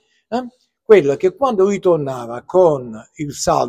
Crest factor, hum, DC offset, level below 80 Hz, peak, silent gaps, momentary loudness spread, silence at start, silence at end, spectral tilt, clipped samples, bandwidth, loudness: 16 dB; none; under 0.1%; -50 dBFS; 0 dBFS; none; 16 LU; 0.3 s; 0 s; -5.5 dB/octave; under 0.1%; 14.5 kHz; -16 LUFS